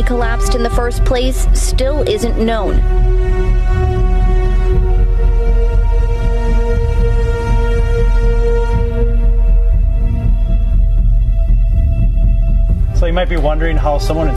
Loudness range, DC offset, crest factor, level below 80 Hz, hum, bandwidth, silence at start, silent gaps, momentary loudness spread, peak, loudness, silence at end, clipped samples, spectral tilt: 0 LU; under 0.1%; 8 dB; -12 dBFS; none; 11.5 kHz; 0 s; none; 1 LU; -4 dBFS; -15 LUFS; 0 s; under 0.1%; -6.5 dB/octave